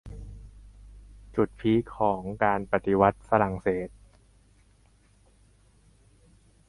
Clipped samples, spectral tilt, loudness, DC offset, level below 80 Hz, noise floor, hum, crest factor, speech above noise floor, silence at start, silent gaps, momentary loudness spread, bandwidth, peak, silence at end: under 0.1%; -8.5 dB/octave; -26 LUFS; under 0.1%; -50 dBFS; -61 dBFS; none; 24 dB; 35 dB; 0.05 s; none; 21 LU; 11.5 kHz; -4 dBFS; 2.8 s